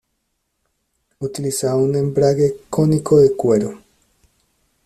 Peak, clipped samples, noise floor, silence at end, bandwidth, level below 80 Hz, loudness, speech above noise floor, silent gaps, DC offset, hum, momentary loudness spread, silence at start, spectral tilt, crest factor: -4 dBFS; under 0.1%; -72 dBFS; 1.1 s; 14 kHz; -52 dBFS; -17 LUFS; 55 dB; none; under 0.1%; none; 12 LU; 1.2 s; -7 dB/octave; 16 dB